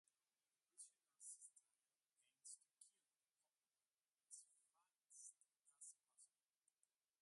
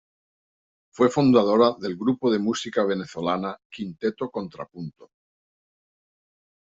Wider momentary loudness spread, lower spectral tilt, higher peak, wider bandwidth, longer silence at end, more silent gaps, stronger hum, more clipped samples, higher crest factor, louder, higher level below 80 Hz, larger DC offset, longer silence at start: second, 5 LU vs 18 LU; second, 3.5 dB/octave vs -6 dB/octave; second, -46 dBFS vs -6 dBFS; first, 11.5 kHz vs 8 kHz; second, 0.95 s vs 1.8 s; second, none vs 3.65-3.70 s; neither; neither; about the same, 24 dB vs 20 dB; second, -63 LUFS vs -23 LUFS; second, under -90 dBFS vs -66 dBFS; neither; second, 0.75 s vs 1 s